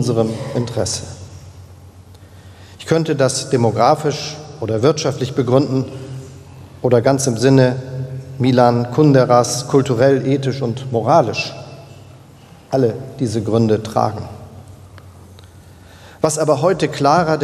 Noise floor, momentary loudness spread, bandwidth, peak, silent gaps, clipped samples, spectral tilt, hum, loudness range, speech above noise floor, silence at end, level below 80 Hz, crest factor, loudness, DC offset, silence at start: -42 dBFS; 15 LU; 14 kHz; 0 dBFS; none; under 0.1%; -6 dB/octave; none; 7 LU; 27 dB; 0 s; -52 dBFS; 18 dB; -16 LUFS; under 0.1%; 0 s